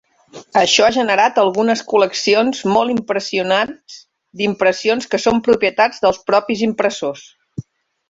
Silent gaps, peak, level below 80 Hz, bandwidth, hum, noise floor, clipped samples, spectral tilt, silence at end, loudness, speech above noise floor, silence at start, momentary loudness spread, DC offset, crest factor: none; 0 dBFS; -54 dBFS; 8 kHz; none; -41 dBFS; under 0.1%; -3.5 dB/octave; 0.5 s; -16 LUFS; 25 dB; 0.35 s; 11 LU; under 0.1%; 16 dB